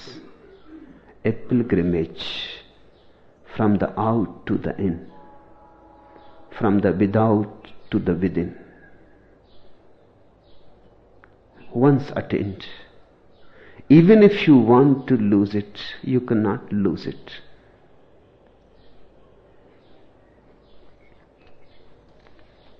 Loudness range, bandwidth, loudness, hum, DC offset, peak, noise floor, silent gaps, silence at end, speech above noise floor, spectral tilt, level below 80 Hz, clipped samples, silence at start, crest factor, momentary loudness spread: 13 LU; 6.4 kHz; -20 LUFS; none; under 0.1%; -2 dBFS; -54 dBFS; none; 1.15 s; 35 dB; -9.5 dB/octave; -54 dBFS; under 0.1%; 0 s; 20 dB; 20 LU